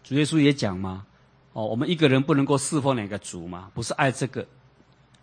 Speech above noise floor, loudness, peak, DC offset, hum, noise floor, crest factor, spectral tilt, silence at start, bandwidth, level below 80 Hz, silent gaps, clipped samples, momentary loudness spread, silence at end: 33 dB; -24 LUFS; -4 dBFS; under 0.1%; none; -57 dBFS; 22 dB; -5.5 dB/octave; 0.05 s; 9.8 kHz; -60 dBFS; none; under 0.1%; 16 LU; 0.8 s